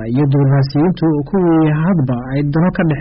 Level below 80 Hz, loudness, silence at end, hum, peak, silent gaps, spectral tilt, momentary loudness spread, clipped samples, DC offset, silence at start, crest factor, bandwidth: -38 dBFS; -14 LUFS; 0 s; none; -6 dBFS; none; -8.5 dB/octave; 4 LU; under 0.1%; under 0.1%; 0 s; 6 dB; 5.6 kHz